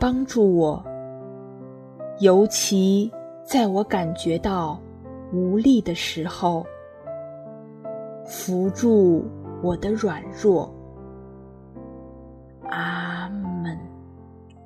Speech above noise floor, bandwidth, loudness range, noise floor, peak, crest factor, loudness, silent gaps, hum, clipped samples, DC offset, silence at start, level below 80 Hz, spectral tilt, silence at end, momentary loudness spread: 25 dB; 14 kHz; 8 LU; -45 dBFS; -4 dBFS; 20 dB; -22 LUFS; none; none; under 0.1%; under 0.1%; 0 s; -50 dBFS; -5.5 dB/octave; 0.3 s; 23 LU